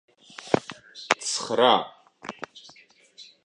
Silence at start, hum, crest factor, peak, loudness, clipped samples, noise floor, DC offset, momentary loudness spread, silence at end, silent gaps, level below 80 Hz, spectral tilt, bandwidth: 0.4 s; none; 28 dB; 0 dBFS; -24 LUFS; under 0.1%; -55 dBFS; under 0.1%; 22 LU; 0.2 s; none; -68 dBFS; -2.5 dB/octave; 11 kHz